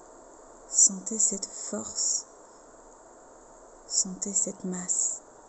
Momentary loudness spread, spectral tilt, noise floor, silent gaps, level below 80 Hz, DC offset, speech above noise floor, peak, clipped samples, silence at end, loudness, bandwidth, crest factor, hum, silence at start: 13 LU; -1.5 dB/octave; -52 dBFS; none; -64 dBFS; under 0.1%; 24 dB; -8 dBFS; under 0.1%; 0 s; -26 LUFS; 8.8 kHz; 24 dB; none; 0 s